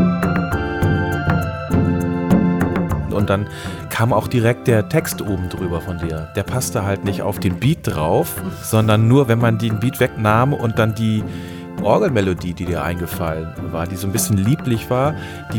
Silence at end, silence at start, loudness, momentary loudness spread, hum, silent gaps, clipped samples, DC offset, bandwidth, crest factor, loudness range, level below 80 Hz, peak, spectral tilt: 0 s; 0 s; -19 LUFS; 8 LU; none; none; under 0.1%; under 0.1%; 19 kHz; 16 dB; 4 LU; -38 dBFS; 0 dBFS; -6.5 dB/octave